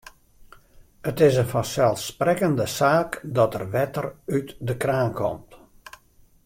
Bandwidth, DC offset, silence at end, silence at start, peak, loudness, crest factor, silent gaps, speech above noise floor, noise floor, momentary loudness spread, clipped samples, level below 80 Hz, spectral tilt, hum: 16.5 kHz; under 0.1%; 0.9 s; 1.05 s; -6 dBFS; -23 LUFS; 18 dB; none; 33 dB; -56 dBFS; 10 LU; under 0.1%; -54 dBFS; -6 dB/octave; none